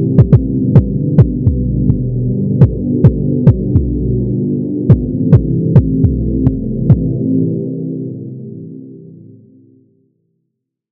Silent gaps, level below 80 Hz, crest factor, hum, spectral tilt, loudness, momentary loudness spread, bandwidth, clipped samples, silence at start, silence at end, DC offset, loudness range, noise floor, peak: none; -24 dBFS; 12 dB; none; -13 dB/octave; -13 LUFS; 11 LU; 2.8 kHz; 2%; 0 s; 1.75 s; under 0.1%; 9 LU; -72 dBFS; 0 dBFS